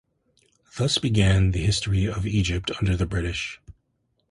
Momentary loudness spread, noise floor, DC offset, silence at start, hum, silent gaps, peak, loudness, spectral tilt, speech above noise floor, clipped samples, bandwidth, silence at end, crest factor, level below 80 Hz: 10 LU; -72 dBFS; under 0.1%; 0.75 s; none; none; -6 dBFS; -24 LUFS; -5 dB/octave; 49 dB; under 0.1%; 11.5 kHz; 0.6 s; 18 dB; -34 dBFS